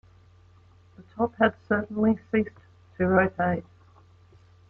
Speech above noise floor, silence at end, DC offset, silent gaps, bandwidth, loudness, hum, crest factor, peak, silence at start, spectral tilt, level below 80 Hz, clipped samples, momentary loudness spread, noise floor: 31 dB; 1.1 s; under 0.1%; none; 4.2 kHz; -26 LUFS; none; 20 dB; -8 dBFS; 1 s; -9.5 dB/octave; -58 dBFS; under 0.1%; 9 LU; -56 dBFS